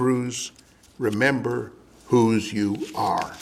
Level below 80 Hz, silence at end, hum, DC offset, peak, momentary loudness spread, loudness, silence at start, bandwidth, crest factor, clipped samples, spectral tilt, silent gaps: -60 dBFS; 0 s; none; under 0.1%; -6 dBFS; 11 LU; -24 LUFS; 0 s; 15 kHz; 18 dB; under 0.1%; -5.5 dB/octave; none